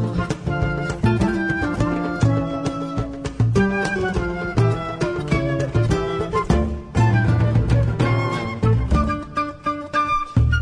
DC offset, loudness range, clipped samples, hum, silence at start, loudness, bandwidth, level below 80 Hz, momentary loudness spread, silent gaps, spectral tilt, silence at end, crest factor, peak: under 0.1%; 2 LU; under 0.1%; none; 0 s; -21 LUFS; 10 kHz; -30 dBFS; 6 LU; none; -7.5 dB/octave; 0 s; 14 dB; -4 dBFS